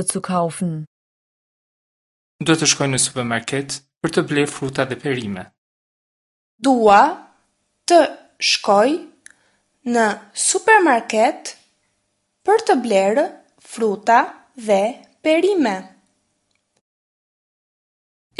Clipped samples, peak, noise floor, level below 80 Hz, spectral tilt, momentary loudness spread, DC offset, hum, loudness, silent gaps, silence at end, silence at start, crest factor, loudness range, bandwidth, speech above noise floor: under 0.1%; 0 dBFS; -70 dBFS; -62 dBFS; -3.5 dB/octave; 14 LU; under 0.1%; none; -18 LUFS; 0.87-2.39 s, 3.97-4.01 s, 5.58-6.58 s; 2.55 s; 0 s; 20 dB; 5 LU; 11.5 kHz; 53 dB